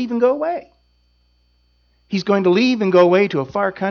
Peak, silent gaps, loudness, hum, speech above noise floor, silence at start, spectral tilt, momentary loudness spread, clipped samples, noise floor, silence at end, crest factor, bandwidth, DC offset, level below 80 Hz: -2 dBFS; none; -17 LUFS; 60 Hz at -45 dBFS; 43 dB; 0 s; -7 dB/octave; 11 LU; under 0.1%; -60 dBFS; 0 s; 16 dB; 6.8 kHz; under 0.1%; -60 dBFS